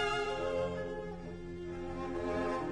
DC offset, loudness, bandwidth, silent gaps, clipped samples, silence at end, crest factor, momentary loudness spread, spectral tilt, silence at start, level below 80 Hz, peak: under 0.1%; -38 LUFS; 11.5 kHz; none; under 0.1%; 0 s; 16 dB; 9 LU; -5.5 dB/octave; 0 s; -50 dBFS; -22 dBFS